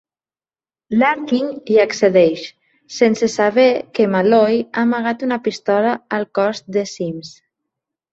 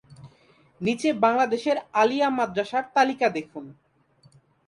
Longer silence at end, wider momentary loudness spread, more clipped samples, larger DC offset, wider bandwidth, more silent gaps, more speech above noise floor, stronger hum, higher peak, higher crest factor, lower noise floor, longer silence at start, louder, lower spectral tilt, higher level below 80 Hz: second, 0.8 s vs 0.95 s; about the same, 10 LU vs 9 LU; neither; neither; second, 8 kHz vs 11.5 kHz; neither; first, over 74 dB vs 36 dB; neither; first, -2 dBFS vs -6 dBFS; about the same, 16 dB vs 20 dB; first, under -90 dBFS vs -60 dBFS; first, 0.9 s vs 0.1 s; first, -17 LUFS vs -24 LUFS; about the same, -5.5 dB/octave vs -5 dB/octave; first, -62 dBFS vs -68 dBFS